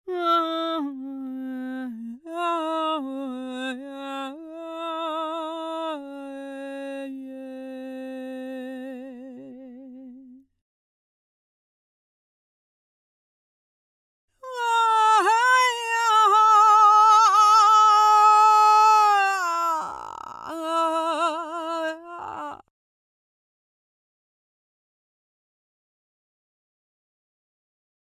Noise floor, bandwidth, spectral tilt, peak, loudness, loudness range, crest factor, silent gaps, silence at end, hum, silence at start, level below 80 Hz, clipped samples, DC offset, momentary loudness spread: -48 dBFS; 15.5 kHz; -1 dB/octave; -8 dBFS; -19 LUFS; 21 LU; 16 dB; 10.61-14.28 s; 5.5 s; none; 0.05 s; -76 dBFS; under 0.1%; under 0.1%; 22 LU